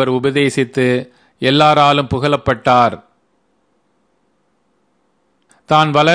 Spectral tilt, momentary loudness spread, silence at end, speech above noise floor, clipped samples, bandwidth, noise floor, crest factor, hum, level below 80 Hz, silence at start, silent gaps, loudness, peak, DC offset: -5.5 dB/octave; 8 LU; 0 s; 49 dB; under 0.1%; 10.5 kHz; -62 dBFS; 16 dB; none; -48 dBFS; 0 s; none; -14 LUFS; 0 dBFS; under 0.1%